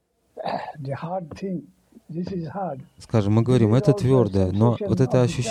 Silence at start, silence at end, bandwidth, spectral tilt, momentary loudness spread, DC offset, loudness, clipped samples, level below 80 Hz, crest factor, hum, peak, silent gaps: 0.35 s; 0 s; 10.5 kHz; -8 dB/octave; 14 LU; under 0.1%; -22 LUFS; under 0.1%; -50 dBFS; 18 dB; none; -4 dBFS; none